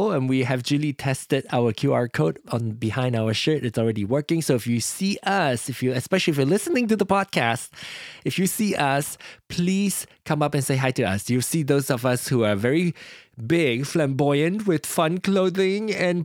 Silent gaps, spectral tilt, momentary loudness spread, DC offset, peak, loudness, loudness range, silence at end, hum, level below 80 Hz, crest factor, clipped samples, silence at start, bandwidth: none; -5 dB/octave; 7 LU; under 0.1%; -4 dBFS; -23 LUFS; 1 LU; 0 s; none; -60 dBFS; 18 dB; under 0.1%; 0 s; 17 kHz